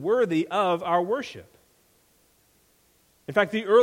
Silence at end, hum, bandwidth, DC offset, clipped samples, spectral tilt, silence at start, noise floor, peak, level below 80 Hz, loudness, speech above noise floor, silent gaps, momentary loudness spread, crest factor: 0 s; none; 16 kHz; under 0.1%; under 0.1%; -6 dB/octave; 0 s; -63 dBFS; -6 dBFS; -68 dBFS; -25 LUFS; 40 dB; none; 16 LU; 20 dB